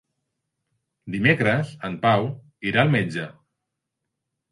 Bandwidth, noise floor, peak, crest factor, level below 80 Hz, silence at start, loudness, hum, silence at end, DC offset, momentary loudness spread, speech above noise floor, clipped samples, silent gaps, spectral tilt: 11.5 kHz; -82 dBFS; -4 dBFS; 20 dB; -60 dBFS; 1.05 s; -22 LUFS; none; 1.2 s; under 0.1%; 13 LU; 60 dB; under 0.1%; none; -7 dB/octave